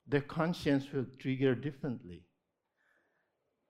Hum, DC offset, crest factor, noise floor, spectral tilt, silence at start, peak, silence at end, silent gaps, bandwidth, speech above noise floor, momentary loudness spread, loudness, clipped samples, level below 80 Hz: none; under 0.1%; 22 dB; -83 dBFS; -7.5 dB/octave; 0.05 s; -14 dBFS; 1.5 s; none; 12.5 kHz; 49 dB; 9 LU; -35 LUFS; under 0.1%; -68 dBFS